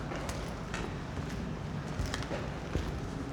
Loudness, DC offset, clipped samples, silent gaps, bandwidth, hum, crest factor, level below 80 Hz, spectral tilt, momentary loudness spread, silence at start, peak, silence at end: -38 LUFS; under 0.1%; under 0.1%; none; 19.5 kHz; none; 22 dB; -44 dBFS; -5.5 dB/octave; 2 LU; 0 s; -14 dBFS; 0 s